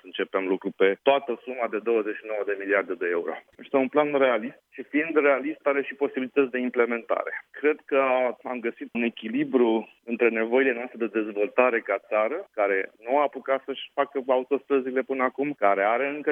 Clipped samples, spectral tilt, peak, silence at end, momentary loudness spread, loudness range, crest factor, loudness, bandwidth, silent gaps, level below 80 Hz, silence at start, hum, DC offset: under 0.1%; -7.5 dB/octave; -6 dBFS; 0 s; 8 LU; 2 LU; 20 dB; -25 LUFS; 3.8 kHz; none; -82 dBFS; 0.05 s; none; under 0.1%